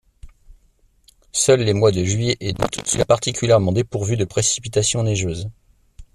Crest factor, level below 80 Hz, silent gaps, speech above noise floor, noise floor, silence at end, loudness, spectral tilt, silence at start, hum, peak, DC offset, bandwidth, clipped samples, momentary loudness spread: 18 dB; -44 dBFS; none; 39 dB; -58 dBFS; 0.1 s; -19 LUFS; -4.5 dB/octave; 0.25 s; none; -2 dBFS; under 0.1%; 13.5 kHz; under 0.1%; 7 LU